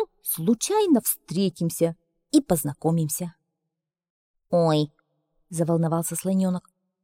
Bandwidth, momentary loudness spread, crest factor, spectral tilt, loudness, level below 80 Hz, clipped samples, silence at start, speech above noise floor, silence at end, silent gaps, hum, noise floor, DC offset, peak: 16.5 kHz; 7 LU; 18 dB; -6 dB/octave; -24 LUFS; -60 dBFS; under 0.1%; 0 s; 61 dB; 0.45 s; 4.10-4.34 s; none; -84 dBFS; under 0.1%; -8 dBFS